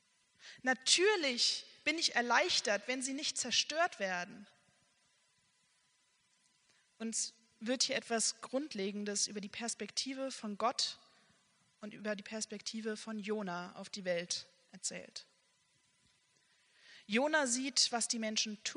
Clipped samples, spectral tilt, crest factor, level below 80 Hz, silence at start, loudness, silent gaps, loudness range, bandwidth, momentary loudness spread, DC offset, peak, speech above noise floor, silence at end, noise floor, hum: under 0.1%; -1.5 dB/octave; 24 dB; -86 dBFS; 0.4 s; -35 LUFS; none; 11 LU; 10.5 kHz; 12 LU; under 0.1%; -14 dBFS; 39 dB; 0 s; -75 dBFS; none